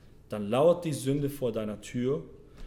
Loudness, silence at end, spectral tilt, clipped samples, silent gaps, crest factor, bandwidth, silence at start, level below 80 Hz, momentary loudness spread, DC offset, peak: -29 LUFS; 0 s; -6.5 dB/octave; under 0.1%; none; 18 dB; 17.5 kHz; 0.3 s; -54 dBFS; 12 LU; under 0.1%; -12 dBFS